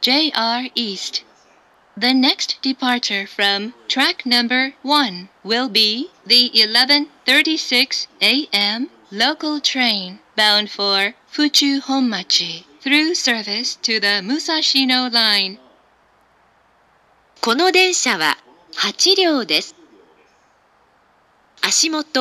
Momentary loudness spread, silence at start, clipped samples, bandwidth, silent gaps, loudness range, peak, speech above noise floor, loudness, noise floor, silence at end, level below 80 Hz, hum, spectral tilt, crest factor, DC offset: 9 LU; 0 s; under 0.1%; 15.5 kHz; none; 5 LU; 0 dBFS; 39 dB; -16 LUFS; -56 dBFS; 0 s; -72 dBFS; none; -1 dB/octave; 18 dB; under 0.1%